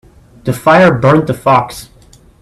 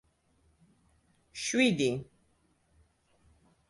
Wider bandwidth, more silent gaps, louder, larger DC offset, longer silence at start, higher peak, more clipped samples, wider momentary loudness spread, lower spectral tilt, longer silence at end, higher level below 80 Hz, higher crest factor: first, 14 kHz vs 11.5 kHz; neither; first, -10 LUFS vs -29 LUFS; neither; second, 0.45 s vs 1.35 s; first, 0 dBFS vs -14 dBFS; neither; about the same, 16 LU vs 15 LU; first, -6.5 dB/octave vs -4 dB/octave; second, 0.55 s vs 1.65 s; first, -42 dBFS vs -68 dBFS; second, 12 dB vs 22 dB